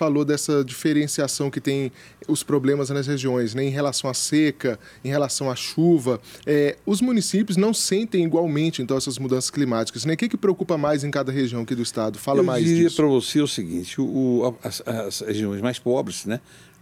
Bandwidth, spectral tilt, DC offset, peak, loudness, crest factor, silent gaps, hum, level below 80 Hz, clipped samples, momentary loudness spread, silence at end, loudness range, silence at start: 16.5 kHz; -5 dB/octave; under 0.1%; -8 dBFS; -23 LUFS; 14 dB; none; none; -62 dBFS; under 0.1%; 8 LU; 0.45 s; 2 LU; 0 s